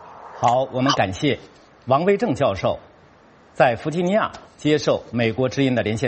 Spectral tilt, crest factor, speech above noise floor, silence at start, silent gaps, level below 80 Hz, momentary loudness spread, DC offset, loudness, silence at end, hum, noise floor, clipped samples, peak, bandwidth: -6 dB/octave; 20 dB; 30 dB; 0 s; none; -52 dBFS; 7 LU; under 0.1%; -21 LUFS; 0 s; none; -51 dBFS; under 0.1%; -2 dBFS; 8.4 kHz